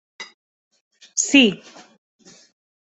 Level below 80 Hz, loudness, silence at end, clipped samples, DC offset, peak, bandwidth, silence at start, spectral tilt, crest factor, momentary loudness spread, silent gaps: -66 dBFS; -17 LUFS; 1.35 s; under 0.1%; under 0.1%; -2 dBFS; 8.4 kHz; 0.2 s; -2 dB/octave; 22 dB; 25 LU; 0.34-0.71 s, 0.81-0.91 s